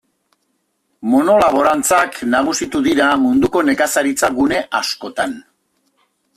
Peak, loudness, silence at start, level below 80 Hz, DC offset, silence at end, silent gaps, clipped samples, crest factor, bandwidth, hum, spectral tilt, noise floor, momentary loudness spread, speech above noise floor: -2 dBFS; -15 LUFS; 1 s; -50 dBFS; under 0.1%; 0.95 s; none; under 0.1%; 14 dB; 15 kHz; none; -3 dB/octave; -67 dBFS; 9 LU; 52 dB